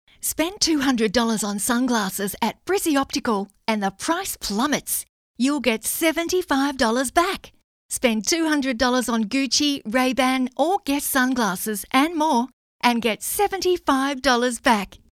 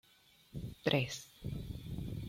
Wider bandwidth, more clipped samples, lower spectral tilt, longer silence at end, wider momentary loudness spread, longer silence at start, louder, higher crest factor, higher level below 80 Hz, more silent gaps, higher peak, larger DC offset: about the same, 17 kHz vs 16.5 kHz; neither; second, -2.5 dB/octave vs -5 dB/octave; first, 0.15 s vs 0 s; second, 5 LU vs 14 LU; second, 0.25 s vs 0.55 s; first, -22 LUFS vs -39 LUFS; second, 18 dB vs 24 dB; about the same, -52 dBFS vs -54 dBFS; first, 5.09-5.34 s, 7.64-7.89 s, 12.53-12.79 s vs none; first, -4 dBFS vs -16 dBFS; neither